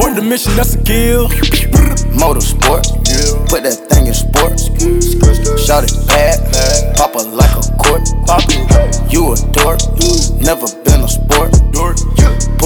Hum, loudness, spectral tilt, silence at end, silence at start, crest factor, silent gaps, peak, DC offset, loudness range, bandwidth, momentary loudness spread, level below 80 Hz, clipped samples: none; -11 LUFS; -4.5 dB/octave; 0 s; 0 s; 10 dB; none; 0 dBFS; under 0.1%; 1 LU; over 20 kHz; 3 LU; -12 dBFS; under 0.1%